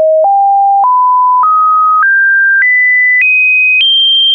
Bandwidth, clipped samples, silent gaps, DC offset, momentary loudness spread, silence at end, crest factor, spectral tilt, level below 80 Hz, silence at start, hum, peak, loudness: 4.2 kHz; under 0.1%; none; under 0.1%; 3 LU; 0 s; 4 dB; 0.5 dB/octave; -68 dBFS; 0 s; none; -4 dBFS; -6 LUFS